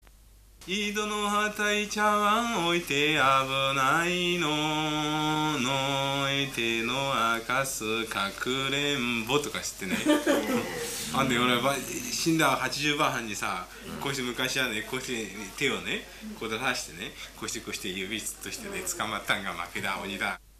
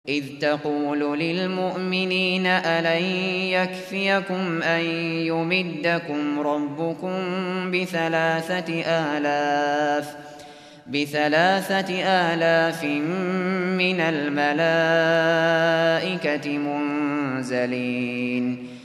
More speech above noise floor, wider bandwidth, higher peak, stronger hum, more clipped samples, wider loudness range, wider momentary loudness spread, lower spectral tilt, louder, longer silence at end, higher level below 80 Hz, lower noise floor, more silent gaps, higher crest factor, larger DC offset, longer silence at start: first, 26 dB vs 21 dB; about the same, 15 kHz vs 14.5 kHz; about the same, -10 dBFS vs -8 dBFS; neither; neither; first, 7 LU vs 4 LU; about the same, 9 LU vs 7 LU; second, -3 dB/octave vs -5.5 dB/octave; second, -28 LUFS vs -23 LUFS; first, 0.2 s vs 0 s; first, -54 dBFS vs -70 dBFS; first, -54 dBFS vs -44 dBFS; neither; about the same, 18 dB vs 16 dB; neither; first, 0.6 s vs 0.05 s